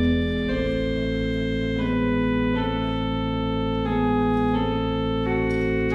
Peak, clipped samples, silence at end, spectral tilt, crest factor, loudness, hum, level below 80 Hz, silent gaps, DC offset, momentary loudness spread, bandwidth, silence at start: -10 dBFS; under 0.1%; 0 s; -8 dB/octave; 12 dB; -24 LUFS; none; -34 dBFS; none; under 0.1%; 3 LU; 7.2 kHz; 0 s